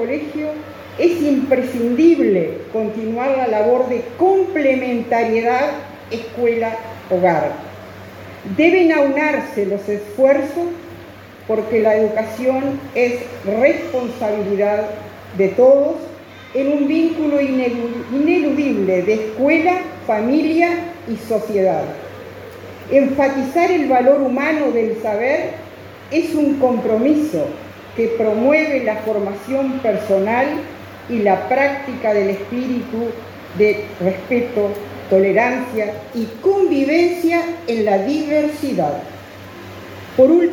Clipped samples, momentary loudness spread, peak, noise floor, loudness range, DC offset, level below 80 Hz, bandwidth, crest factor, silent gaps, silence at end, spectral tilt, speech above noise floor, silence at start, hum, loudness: under 0.1%; 16 LU; 0 dBFS; -37 dBFS; 3 LU; under 0.1%; -58 dBFS; 17 kHz; 18 dB; none; 0 s; -6.5 dB/octave; 21 dB; 0 s; none; -17 LUFS